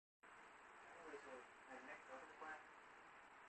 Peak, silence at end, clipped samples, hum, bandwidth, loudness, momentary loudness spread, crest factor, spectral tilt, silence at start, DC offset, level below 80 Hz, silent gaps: -44 dBFS; 0 s; under 0.1%; none; 8.4 kHz; -59 LUFS; 7 LU; 16 dB; -3 dB/octave; 0.25 s; under 0.1%; -90 dBFS; none